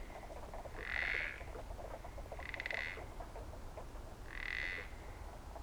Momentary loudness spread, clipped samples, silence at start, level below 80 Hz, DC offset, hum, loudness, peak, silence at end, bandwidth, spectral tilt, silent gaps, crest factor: 13 LU; under 0.1%; 0 s; -52 dBFS; under 0.1%; none; -44 LUFS; -24 dBFS; 0 s; over 20 kHz; -4 dB/octave; none; 22 dB